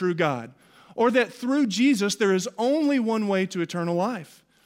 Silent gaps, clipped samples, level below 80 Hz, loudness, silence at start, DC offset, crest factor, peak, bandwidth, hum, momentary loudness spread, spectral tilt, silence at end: none; under 0.1%; -74 dBFS; -24 LUFS; 0 s; under 0.1%; 16 dB; -8 dBFS; 16 kHz; none; 8 LU; -5 dB/octave; 0.4 s